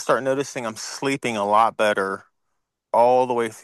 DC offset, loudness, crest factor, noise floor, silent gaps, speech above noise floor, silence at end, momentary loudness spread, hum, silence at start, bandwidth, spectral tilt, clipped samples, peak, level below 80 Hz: under 0.1%; -21 LUFS; 18 dB; -77 dBFS; none; 56 dB; 0.05 s; 11 LU; none; 0 s; 12.5 kHz; -4 dB/octave; under 0.1%; -4 dBFS; -72 dBFS